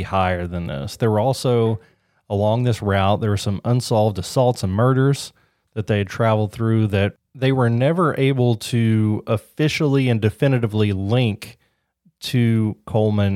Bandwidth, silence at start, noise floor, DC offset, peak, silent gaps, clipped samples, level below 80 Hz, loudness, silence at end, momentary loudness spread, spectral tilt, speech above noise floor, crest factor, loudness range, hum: 15 kHz; 0 s; -62 dBFS; under 0.1%; -4 dBFS; none; under 0.1%; -50 dBFS; -20 LUFS; 0 s; 7 LU; -7 dB/octave; 43 dB; 16 dB; 2 LU; none